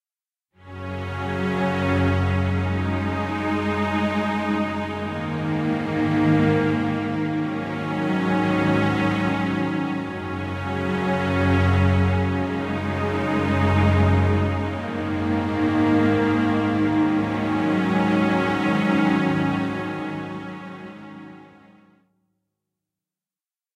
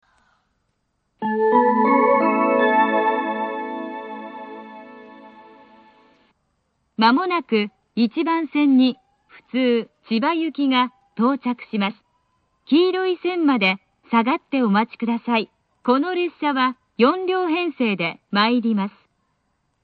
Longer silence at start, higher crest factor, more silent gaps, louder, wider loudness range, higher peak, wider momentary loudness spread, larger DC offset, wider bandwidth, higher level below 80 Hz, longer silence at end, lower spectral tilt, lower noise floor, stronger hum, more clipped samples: second, 0.65 s vs 1.2 s; about the same, 16 dB vs 20 dB; neither; about the same, -22 LUFS vs -20 LUFS; about the same, 4 LU vs 6 LU; second, -8 dBFS vs -2 dBFS; second, 10 LU vs 13 LU; neither; first, 10 kHz vs 4.9 kHz; first, -48 dBFS vs -70 dBFS; first, 2.3 s vs 0.95 s; about the same, -7.5 dB/octave vs -8.5 dB/octave; first, under -90 dBFS vs -71 dBFS; neither; neither